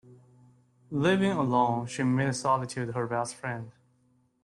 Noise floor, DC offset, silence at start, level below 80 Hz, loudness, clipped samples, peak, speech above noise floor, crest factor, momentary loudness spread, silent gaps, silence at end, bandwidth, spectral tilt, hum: -68 dBFS; under 0.1%; 0.1 s; -66 dBFS; -28 LUFS; under 0.1%; -12 dBFS; 40 dB; 18 dB; 11 LU; none; 0.75 s; 12 kHz; -6 dB/octave; none